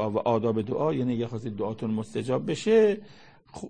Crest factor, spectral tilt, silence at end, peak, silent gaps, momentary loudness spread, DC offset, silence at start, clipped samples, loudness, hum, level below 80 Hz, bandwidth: 16 dB; -7 dB/octave; 0 s; -10 dBFS; none; 11 LU; 0.2%; 0 s; under 0.1%; -27 LUFS; none; -62 dBFS; 9.8 kHz